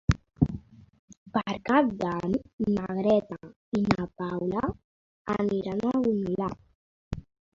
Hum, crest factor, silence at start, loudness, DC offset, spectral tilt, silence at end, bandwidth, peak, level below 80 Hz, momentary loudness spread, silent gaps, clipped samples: none; 22 dB; 0.1 s; -28 LUFS; under 0.1%; -8 dB/octave; 0.35 s; 7.6 kHz; -6 dBFS; -46 dBFS; 16 LU; 0.99-1.08 s, 1.17-1.26 s, 2.53-2.58 s, 3.56-3.72 s, 4.84-5.25 s, 6.75-7.11 s; under 0.1%